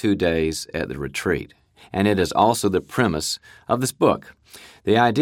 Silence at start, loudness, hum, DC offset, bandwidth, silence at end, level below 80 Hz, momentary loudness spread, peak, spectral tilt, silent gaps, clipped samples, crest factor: 0 s; -22 LUFS; none; under 0.1%; 17.5 kHz; 0 s; -46 dBFS; 10 LU; -2 dBFS; -5 dB/octave; none; under 0.1%; 18 dB